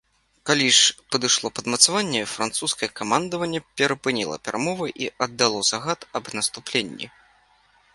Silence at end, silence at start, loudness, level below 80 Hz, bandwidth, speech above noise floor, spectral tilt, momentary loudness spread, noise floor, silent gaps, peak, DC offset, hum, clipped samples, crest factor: 0.85 s; 0.45 s; -22 LUFS; -62 dBFS; 11.5 kHz; 36 dB; -1.5 dB/octave; 12 LU; -60 dBFS; none; 0 dBFS; under 0.1%; none; under 0.1%; 24 dB